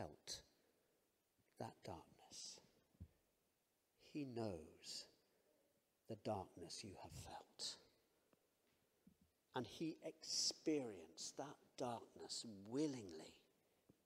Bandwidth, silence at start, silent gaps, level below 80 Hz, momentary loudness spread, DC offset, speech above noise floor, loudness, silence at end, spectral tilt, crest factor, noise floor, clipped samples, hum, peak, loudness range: 15.5 kHz; 0 s; none; -82 dBFS; 15 LU; under 0.1%; 37 dB; -50 LUFS; 0.65 s; -3.5 dB/octave; 22 dB; -86 dBFS; under 0.1%; none; -30 dBFS; 11 LU